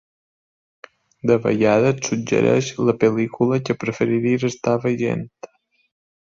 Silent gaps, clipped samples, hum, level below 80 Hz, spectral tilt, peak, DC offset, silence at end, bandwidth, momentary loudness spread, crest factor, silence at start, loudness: none; under 0.1%; none; -58 dBFS; -6 dB/octave; -4 dBFS; under 0.1%; 0.75 s; 7.8 kHz; 7 LU; 18 dB; 1.25 s; -20 LUFS